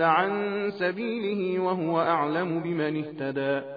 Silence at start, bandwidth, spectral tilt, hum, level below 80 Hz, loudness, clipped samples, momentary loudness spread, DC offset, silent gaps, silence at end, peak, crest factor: 0 s; 5 kHz; -9 dB/octave; none; -74 dBFS; -27 LUFS; under 0.1%; 5 LU; under 0.1%; none; 0 s; -10 dBFS; 18 dB